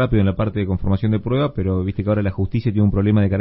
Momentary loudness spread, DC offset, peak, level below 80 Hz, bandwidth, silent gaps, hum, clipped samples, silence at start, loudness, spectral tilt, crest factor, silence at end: 5 LU; under 0.1%; -4 dBFS; -34 dBFS; 5.2 kHz; none; none; under 0.1%; 0 s; -20 LUFS; -13.5 dB/octave; 14 dB; 0 s